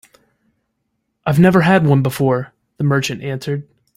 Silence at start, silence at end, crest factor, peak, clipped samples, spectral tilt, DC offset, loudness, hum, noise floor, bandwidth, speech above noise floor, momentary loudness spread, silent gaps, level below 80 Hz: 1.25 s; 0.35 s; 16 dB; 0 dBFS; under 0.1%; -7 dB/octave; under 0.1%; -16 LUFS; none; -71 dBFS; 16 kHz; 57 dB; 14 LU; none; -52 dBFS